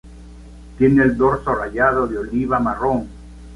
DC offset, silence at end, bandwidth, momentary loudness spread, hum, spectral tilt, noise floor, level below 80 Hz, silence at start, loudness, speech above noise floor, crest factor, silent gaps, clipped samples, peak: under 0.1%; 0 s; 11 kHz; 8 LU; none; -9 dB/octave; -39 dBFS; -38 dBFS; 0.05 s; -18 LUFS; 21 dB; 16 dB; none; under 0.1%; -2 dBFS